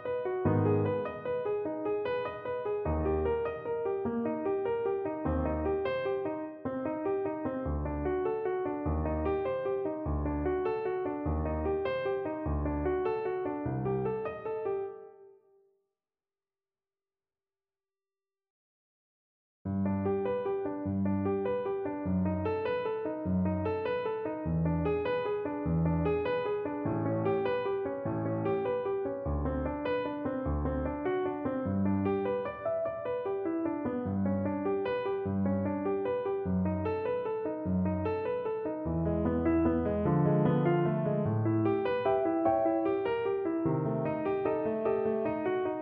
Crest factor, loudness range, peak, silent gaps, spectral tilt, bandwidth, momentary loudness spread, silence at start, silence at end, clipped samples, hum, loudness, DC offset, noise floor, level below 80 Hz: 16 dB; 5 LU; -14 dBFS; 18.50-19.65 s; -11.5 dB/octave; 4.9 kHz; 6 LU; 0 s; 0 s; under 0.1%; none; -32 LUFS; under 0.1%; under -90 dBFS; -46 dBFS